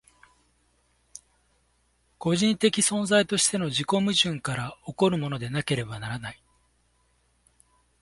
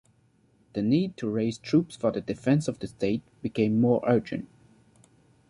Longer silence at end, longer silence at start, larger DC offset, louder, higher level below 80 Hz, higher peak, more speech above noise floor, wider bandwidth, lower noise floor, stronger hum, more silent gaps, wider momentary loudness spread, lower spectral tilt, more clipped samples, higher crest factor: first, 1.7 s vs 1.05 s; first, 2.2 s vs 0.75 s; neither; about the same, -25 LUFS vs -27 LUFS; about the same, -60 dBFS vs -60 dBFS; about the same, -8 dBFS vs -10 dBFS; first, 43 dB vs 38 dB; about the same, 11.5 kHz vs 11 kHz; first, -68 dBFS vs -64 dBFS; neither; neither; first, 16 LU vs 11 LU; second, -3.5 dB/octave vs -7.5 dB/octave; neither; about the same, 22 dB vs 18 dB